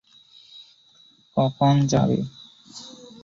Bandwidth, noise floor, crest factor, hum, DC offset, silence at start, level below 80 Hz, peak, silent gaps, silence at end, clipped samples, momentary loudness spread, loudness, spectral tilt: 7.6 kHz; -56 dBFS; 18 dB; none; under 0.1%; 0.55 s; -56 dBFS; -6 dBFS; none; 0.35 s; under 0.1%; 23 LU; -22 LUFS; -7 dB/octave